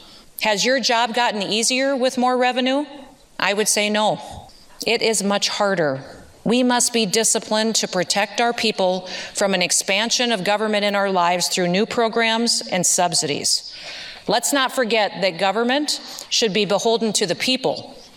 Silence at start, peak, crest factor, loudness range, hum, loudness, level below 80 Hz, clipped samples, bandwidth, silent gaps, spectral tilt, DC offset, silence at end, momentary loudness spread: 0 s; -2 dBFS; 18 dB; 2 LU; none; -19 LUFS; -60 dBFS; under 0.1%; 17.5 kHz; none; -2 dB/octave; under 0.1%; 0.1 s; 7 LU